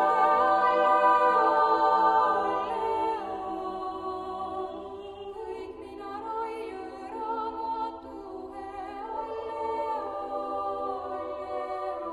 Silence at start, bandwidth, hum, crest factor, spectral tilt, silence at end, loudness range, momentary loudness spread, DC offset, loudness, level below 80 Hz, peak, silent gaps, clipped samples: 0 s; 11 kHz; none; 18 dB; -5 dB/octave; 0 s; 12 LU; 17 LU; under 0.1%; -28 LUFS; -60 dBFS; -12 dBFS; none; under 0.1%